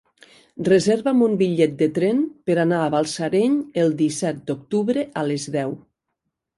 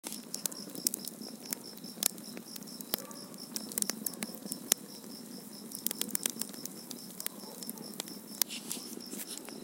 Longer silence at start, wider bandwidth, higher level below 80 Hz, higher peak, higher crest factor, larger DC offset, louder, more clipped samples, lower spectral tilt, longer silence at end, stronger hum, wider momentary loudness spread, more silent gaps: first, 0.55 s vs 0.05 s; second, 11.5 kHz vs 17 kHz; first, -64 dBFS vs -86 dBFS; second, -4 dBFS vs 0 dBFS; second, 16 dB vs 38 dB; neither; first, -21 LUFS vs -37 LUFS; neither; first, -6 dB/octave vs -1.5 dB/octave; first, 0.8 s vs 0 s; neither; second, 8 LU vs 12 LU; neither